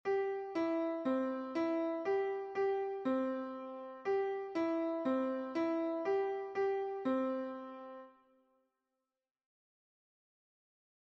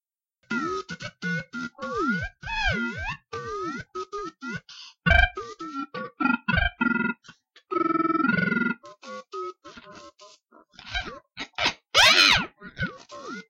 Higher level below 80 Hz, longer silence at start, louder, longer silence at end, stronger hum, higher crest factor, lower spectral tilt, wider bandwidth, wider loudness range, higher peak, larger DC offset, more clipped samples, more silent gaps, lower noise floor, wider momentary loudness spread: second, -82 dBFS vs -40 dBFS; second, 0.05 s vs 0.5 s; second, -37 LUFS vs -24 LUFS; first, 2.95 s vs 0.05 s; neither; second, 14 dB vs 22 dB; first, -6 dB/octave vs -3.5 dB/octave; second, 6.8 kHz vs 16.5 kHz; about the same, 7 LU vs 8 LU; second, -24 dBFS vs -4 dBFS; neither; neither; neither; first, under -90 dBFS vs -71 dBFS; second, 9 LU vs 18 LU